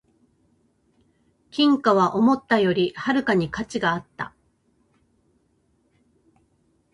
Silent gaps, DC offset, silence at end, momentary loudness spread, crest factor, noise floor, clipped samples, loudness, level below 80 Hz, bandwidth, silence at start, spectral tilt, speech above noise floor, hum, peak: none; under 0.1%; 2.65 s; 15 LU; 20 dB; -66 dBFS; under 0.1%; -21 LUFS; -60 dBFS; 11 kHz; 1.55 s; -6 dB/octave; 45 dB; none; -4 dBFS